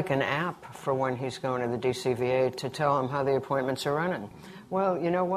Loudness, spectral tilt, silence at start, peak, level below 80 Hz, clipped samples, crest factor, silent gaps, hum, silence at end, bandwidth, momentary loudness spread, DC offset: -29 LUFS; -6 dB/octave; 0 s; -12 dBFS; -64 dBFS; under 0.1%; 18 dB; none; none; 0 s; 14 kHz; 7 LU; under 0.1%